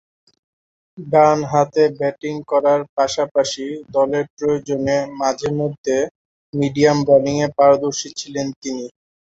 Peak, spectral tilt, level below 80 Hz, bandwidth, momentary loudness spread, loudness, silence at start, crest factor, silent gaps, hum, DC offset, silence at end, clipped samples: 0 dBFS; -5 dB/octave; -56 dBFS; 8 kHz; 13 LU; -18 LUFS; 0.95 s; 18 dB; 2.89-2.97 s, 3.31-3.35 s, 4.30-4.37 s, 5.78-5.84 s, 6.11-6.53 s, 8.56-8.62 s; none; under 0.1%; 0.4 s; under 0.1%